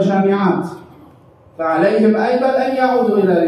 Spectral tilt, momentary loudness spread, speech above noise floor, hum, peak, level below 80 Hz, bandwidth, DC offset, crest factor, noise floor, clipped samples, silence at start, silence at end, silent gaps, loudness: -8 dB/octave; 8 LU; 31 dB; none; -2 dBFS; -64 dBFS; 11 kHz; under 0.1%; 12 dB; -46 dBFS; under 0.1%; 0 s; 0 s; none; -15 LUFS